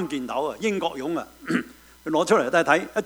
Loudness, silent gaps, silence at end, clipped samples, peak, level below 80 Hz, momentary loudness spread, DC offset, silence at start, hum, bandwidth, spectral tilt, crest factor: -24 LUFS; none; 0 s; under 0.1%; -4 dBFS; -60 dBFS; 11 LU; under 0.1%; 0 s; none; over 20 kHz; -4.5 dB/octave; 20 dB